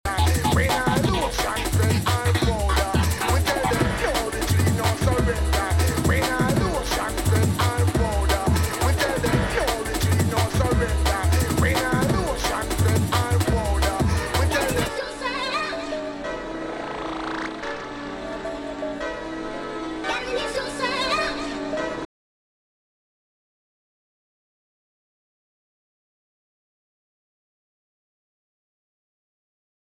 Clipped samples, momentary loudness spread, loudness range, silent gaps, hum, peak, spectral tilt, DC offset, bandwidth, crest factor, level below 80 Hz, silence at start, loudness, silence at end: under 0.1%; 10 LU; 8 LU; none; none; -6 dBFS; -5 dB/octave; under 0.1%; 17 kHz; 18 dB; -32 dBFS; 0.05 s; -23 LUFS; 7.95 s